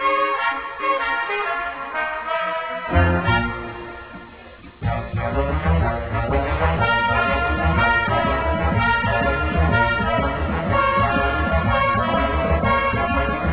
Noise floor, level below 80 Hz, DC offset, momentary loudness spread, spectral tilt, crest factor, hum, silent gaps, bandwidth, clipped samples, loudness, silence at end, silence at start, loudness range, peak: -41 dBFS; -28 dBFS; under 0.1%; 8 LU; -10 dB/octave; 16 dB; none; none; 4 kHz; under 0.1%; -20 LUFS; 0 s; 0 s; 4 LU; -4 dBFS